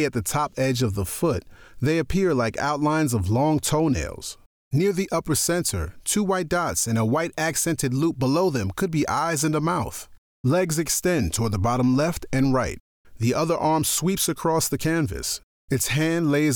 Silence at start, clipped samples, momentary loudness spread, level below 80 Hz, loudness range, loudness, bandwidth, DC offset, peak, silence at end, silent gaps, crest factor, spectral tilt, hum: 0 s; under 0.1%; 6 LU; -44 dBFS; 1 LU; -23 LUFS; over 20 kHz; under 0.1%; -12 dBFS; 0 s; 4.46-4.71 s, 10.18-10.44 s, 12.80-13.04 s, 15.43-15.68 s; 12 dB; -5 dB/octave; none